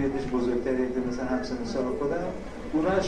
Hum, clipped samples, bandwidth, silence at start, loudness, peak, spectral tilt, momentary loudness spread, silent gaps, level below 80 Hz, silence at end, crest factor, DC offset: none; under 0.1%; 10 kHz; 0 s; -29 LUFS; -12 dBFS; -6.5 dB/octave; 4 LU; none; -44 dBFS; 0 s; 16 dB; 0.5%